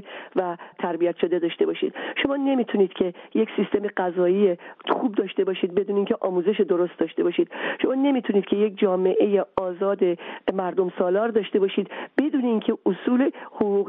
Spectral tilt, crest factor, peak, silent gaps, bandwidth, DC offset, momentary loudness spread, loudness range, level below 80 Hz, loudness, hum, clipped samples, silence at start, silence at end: -4.5 dB/octave; 16 dB; -8 dBFS; none; 3.9 kHz; under 0.1%; 6 LU; 1 LU; -68 dBFS; -24 LUFS; none; under 0.1%; 0 s; 0 s